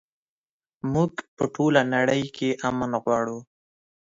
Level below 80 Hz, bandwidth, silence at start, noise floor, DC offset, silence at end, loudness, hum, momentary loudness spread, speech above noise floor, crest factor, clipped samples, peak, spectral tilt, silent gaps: -60 dBFS; 7.8 kHz; 0.85 s; under -90 dBFS; under 0.1%; 0.75 s; -25 LUFS; none; 9 LU; over 66 dB; 22 dB; under 0.1%; -4 dBFS; -6 dB/octave; 1.28-1.37 s